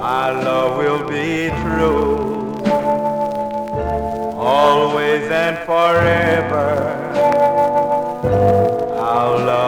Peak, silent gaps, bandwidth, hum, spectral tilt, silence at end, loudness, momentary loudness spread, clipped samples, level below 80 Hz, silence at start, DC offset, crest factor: -2 dBFS; none; 19.5 kHz; none; -6.5 dB/octave; 0 s; -17 LUFS; 7 LU; under 0.1%; -40 dBFS; 0 s; under 0.1%; 14 dB